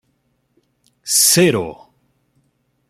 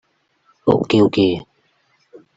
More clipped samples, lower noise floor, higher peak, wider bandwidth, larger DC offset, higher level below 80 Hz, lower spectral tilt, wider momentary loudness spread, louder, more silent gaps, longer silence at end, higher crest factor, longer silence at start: neither; first, -66 dBFS vs -62 dBFS; about the same, 0 dBFS vs -2 dBFS; first, 16 kHz vs 7.8 kHz; neither; second, -58 dBFS vs -52 dBFS; second, -2.5 dB/octave vs -7.5 dB/octave; first, 20 LU vs 9 LU; first, -13 LUFS vs -17 LUFS; neither; first, 1.15 s vs 0.95 s; about the same, 20 dB vs 18 dB; first, 1.05 s vs 0.65 s